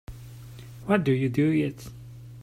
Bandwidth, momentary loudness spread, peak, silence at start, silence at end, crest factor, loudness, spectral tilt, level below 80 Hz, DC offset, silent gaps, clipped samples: 16 kHz; 21 LU; -8 dBFS; 0.1 s; 0 s; 20 dB; -25 LUFS; -8 dB/octave; -52 dBFS; under 0.1%; none; under 0.1%